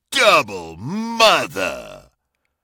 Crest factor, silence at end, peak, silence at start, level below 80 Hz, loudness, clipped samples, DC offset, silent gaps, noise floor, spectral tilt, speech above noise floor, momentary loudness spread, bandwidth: 20 dB; 0.65 s; 0 dBFS; 0.1 s; -54 dBFS; -16 LUFS; under 0.1%; under 0.1%; none; -72 dBFS; -2.5 dB/octave; 53 dB; 16 LU; 17.5 kHz